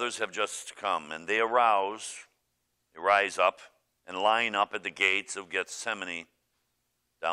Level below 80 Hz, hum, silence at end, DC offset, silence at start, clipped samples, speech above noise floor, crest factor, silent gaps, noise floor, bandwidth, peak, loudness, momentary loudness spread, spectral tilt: -78 dBFS; none; 0 s; under 0.1%; 0 s; under 0.1%; 49 dB; 22 dB; none; -78 dBFS; 13.5 kHz; -10 dBFS; -28 LUFS; 12 LU; -1 dB/octave